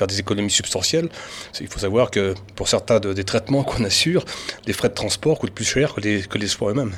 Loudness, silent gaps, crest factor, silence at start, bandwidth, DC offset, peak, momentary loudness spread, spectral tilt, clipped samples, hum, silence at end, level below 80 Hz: -21 LUFS; none; 18 dB; 0 s; 17 kHz; under 0.1%; -4 dBFS; 9 LU; -4 dB/octave; under 0.1%; none; 0 s; -44 dBFS